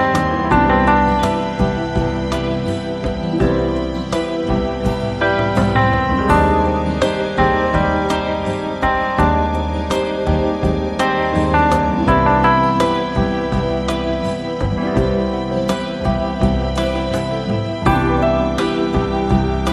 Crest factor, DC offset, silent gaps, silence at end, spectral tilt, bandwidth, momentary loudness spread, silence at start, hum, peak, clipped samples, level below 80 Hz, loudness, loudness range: 16 dB; under 0.1%; none; 0 s; -6.5 dB/octave; 13 kHz; 7 LU; 0 s; none; 0 dBFS; under 0.1%; -26 dBFS; -17 LUFS; 3 LU